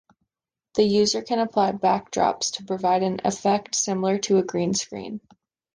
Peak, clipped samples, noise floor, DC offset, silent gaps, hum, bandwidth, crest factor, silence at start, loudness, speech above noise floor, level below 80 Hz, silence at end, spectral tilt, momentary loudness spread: -8 dBFS; under 0.1%; -88 dBFS; under 0.1%; none; none; 10.5 kHz; 16 dB; 0.75 s; -23 LUFS; 65 dB; -62 dBFS; 0.55 s; -4 dB/octave; 7 LU